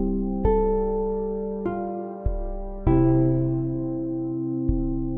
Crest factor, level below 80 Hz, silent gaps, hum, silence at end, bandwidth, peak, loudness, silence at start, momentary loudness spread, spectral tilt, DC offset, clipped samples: 16 dB; -32 dBFS; none; none; 0 s; 3.3 kHz; -8 dBFS; -25 LUFS; 0 s; 10 LU; -14 dB/octave; under 0.1%; under 0.1%